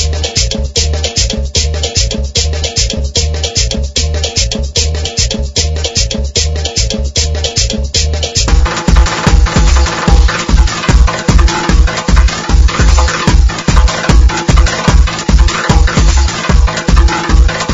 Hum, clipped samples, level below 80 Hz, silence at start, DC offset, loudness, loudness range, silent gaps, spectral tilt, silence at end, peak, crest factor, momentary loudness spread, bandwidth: none; 2%; -12 dBFS; 0 s; under 0.1%; -11 LUFS; 3 LU; none; -3.5 dB/octave; 0 s; 0 dBFS; 10 dB; 3 LU; 7.8 kHz